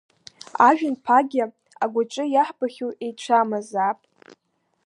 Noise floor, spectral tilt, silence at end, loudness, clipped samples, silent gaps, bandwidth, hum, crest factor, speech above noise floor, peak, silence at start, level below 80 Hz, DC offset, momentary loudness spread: -72 dBFS; -4.5 dB/octave; 0.9 s; -22 LUFS; under 0.1%; none; 11 kHz; none; 20 dB; 50 dB; -2 dBFS; 0.55 s; -80 dBFS; under 0.1%; 14 LU